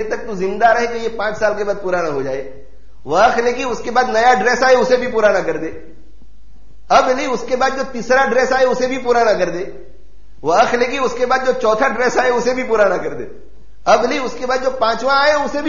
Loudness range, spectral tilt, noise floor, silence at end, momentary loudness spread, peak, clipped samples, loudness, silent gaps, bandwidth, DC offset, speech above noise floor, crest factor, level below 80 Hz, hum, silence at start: 3 LU; -2 dB/octave; -45 dBFS; 0 s; 10 LU; -2 dBFS; under 0.1%; -16 LUFS; none; 7.2 kHz; 4%; 29 dB; 16 dB; -44 dBFS; none; 0 s